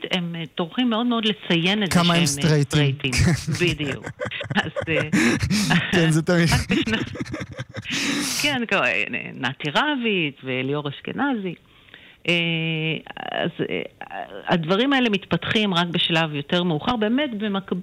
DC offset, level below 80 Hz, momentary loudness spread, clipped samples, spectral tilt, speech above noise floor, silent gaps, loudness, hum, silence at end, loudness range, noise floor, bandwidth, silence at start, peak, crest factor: under 0.1%; -46 dBFS; 11 LU; under 0.1%; -4.5 dB/octave; 26 dB; none; -22 LUFS; none; 0 s; 5 LU; -48 dBFS; 16 kHz; 0 s; -8 dBFS; 14 dB